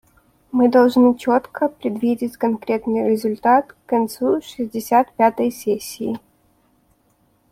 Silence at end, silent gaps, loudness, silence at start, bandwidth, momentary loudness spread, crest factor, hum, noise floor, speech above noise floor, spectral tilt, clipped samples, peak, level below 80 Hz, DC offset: 1.35 s; none; -19 LUFS; 0.55 s; 16 kHz; 11 LU; 16 dB; none; -61 dBFS; 43 dB; -5.5 dB/octave; under 0.1%; -2 dBFS; -60 dBFS; under 0.1%